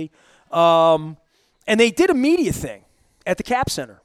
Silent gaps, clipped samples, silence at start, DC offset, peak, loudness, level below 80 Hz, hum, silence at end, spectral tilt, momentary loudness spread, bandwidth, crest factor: none; under 0.1%; 0 s; under 0.1%; -2 dBFS; -18 LUFS; -46 dBFS; none; 0.2 s; -4.5 dB/octave; 18 LU; 15.5 kHz; 18 dB